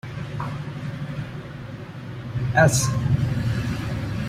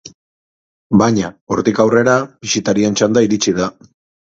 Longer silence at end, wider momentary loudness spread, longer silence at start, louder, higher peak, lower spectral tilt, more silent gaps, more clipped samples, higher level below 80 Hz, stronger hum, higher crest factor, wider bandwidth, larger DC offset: second, 0 s vs 0.55 s; first, 18 LU vs 7 LU; about the same, 0.05 s vs 0.05 s; second, -24 LUFS vs -15 LUFS; about the same, -2 dBFS vs 0 dBFS; about the same, -5.5 dB/octave vs -5 dB/octave; second, none vs 0.14-0.90 s, 1.41-1.47 s; neither; first, -42 dBFS vs -50 dBFS; neither; first, 22 dB vs 16 dB; first, 16 kHz vs 7.8 kHz; neither